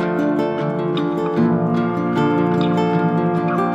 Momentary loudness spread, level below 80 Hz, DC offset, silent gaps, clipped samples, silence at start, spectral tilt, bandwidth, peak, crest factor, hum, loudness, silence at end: 3 LU; -56 dBFS; under 0.1%; none; under 0.1%; 0 s; -8.5 dB/octave; 8 kHz; -6 dBFS; 12 dB; none; -19 LUFS; 0 s